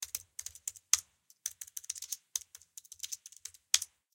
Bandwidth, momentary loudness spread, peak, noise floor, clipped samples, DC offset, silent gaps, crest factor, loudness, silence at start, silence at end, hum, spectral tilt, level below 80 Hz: 17 kHz; 18 LU; -6 dBFS; -55 dBFS; under 0.1%; under 0.1%; none; 34 dB; -36 LUFS; 0 s; 0.3 s; none; 4 dB/octave; -76 dBFS